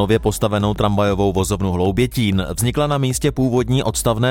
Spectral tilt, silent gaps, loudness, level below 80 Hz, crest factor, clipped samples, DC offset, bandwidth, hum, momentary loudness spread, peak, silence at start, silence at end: -5.5 dB/octave; none; -18 LUFS; -34 dBFS; 16 dB; under 0.1%; under 0.1%; 18 kHz; none; 2 LU; -2 dBFS; 0 s; 0 s